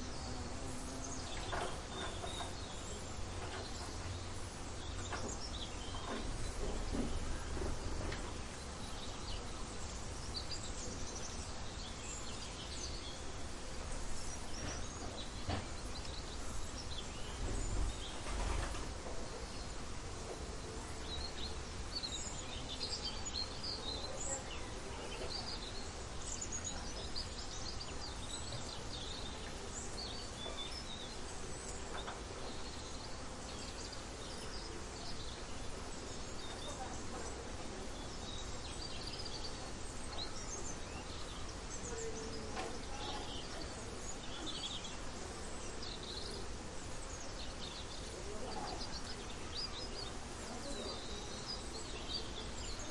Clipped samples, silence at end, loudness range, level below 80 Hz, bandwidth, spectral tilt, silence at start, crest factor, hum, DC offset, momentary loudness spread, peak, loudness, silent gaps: under 0.1%; 0 s; 3 LU; -48 dBFS; 11.5 kHz; -3 dB/octave; 0 s; 18 dB; none; under 0.1%; 5 LU; -26 dBFS; -44 LUFS; none